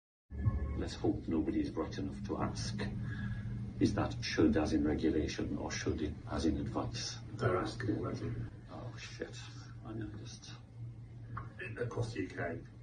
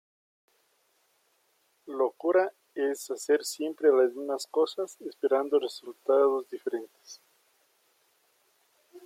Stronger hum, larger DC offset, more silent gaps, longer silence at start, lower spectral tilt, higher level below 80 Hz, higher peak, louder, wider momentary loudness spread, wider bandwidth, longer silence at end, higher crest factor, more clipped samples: neither; neither; neither; second, 0.3 s vs 1.85 s; first, -6 dB/octave vs -2.5 dB/octave; first, -48 dBFS vs under -90 dBFS; second, -16 dBFS vs -12 dBFS; second, -37 LUFS vs -28 LUFS; about the same, 15 LU vs 13 LU; second, 9.6 kHz vs 16 kHz; about the same, 0 s vs 0.05 s; about the same, 20 dB vs 18 dB; neither